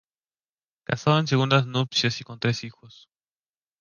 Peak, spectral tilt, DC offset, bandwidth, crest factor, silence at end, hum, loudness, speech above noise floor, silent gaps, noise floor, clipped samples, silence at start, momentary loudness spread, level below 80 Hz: -6 dBFS; -5.5 dB/octave; under 0.1%; 7.2 kHz; 20 dB; 0.95 s; none; -24 LUFS; over 66 dB; none; under -90 dBFS; under 0.1%; 0.9 s; 11 LU; -62 dBFS